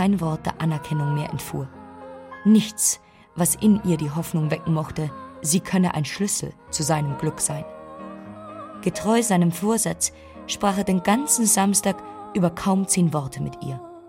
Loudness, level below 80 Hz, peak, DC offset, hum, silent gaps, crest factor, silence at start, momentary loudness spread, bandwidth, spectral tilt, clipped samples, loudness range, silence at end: -22 LUFS; -52 dBFS; -4 dBFS; under 0.1%; none; none; 18 dB; 0 s; 19 LU; 16.5 kHz; -4.5 dB/octave; under 0.1%; 4 LU; 0 s